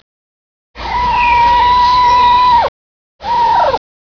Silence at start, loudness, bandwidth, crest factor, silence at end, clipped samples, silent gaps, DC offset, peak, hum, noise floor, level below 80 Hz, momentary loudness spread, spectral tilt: 0.75 s; -10 LUFS; 5.4 kHz; 12 dB; 0.2 s; under 0.1%; 2.68-3.19 s; under 0.1%; 0 dBFS; none; under -90 dBFS; -32 dBFS; 11 LU; -4 dB/octave